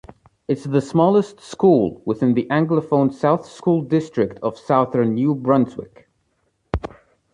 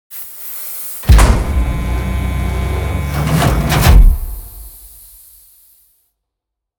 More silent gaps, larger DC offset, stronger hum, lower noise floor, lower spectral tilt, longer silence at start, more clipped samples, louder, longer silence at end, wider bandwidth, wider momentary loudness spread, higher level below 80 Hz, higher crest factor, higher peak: neither; neither; neither; second, -68 dBFS vs -79 dBFS; first, -8.5 dB/octave vs -5.5 dB/octave; first, 0.5 s vs 0.1 s; second, under 0.1% vs 0.3%; second, -19 LUFS vs -15 LUFS; second, 0.45 s vs 1.9 s; second, 10.5 kHz vs over 20 kHz; second, 12 LU vs 23 LU; second, -44 dBFS vs -16 dBFS; about the same, 16 dB vs 14 dB; second, -4 dBFS vs 0 dBFS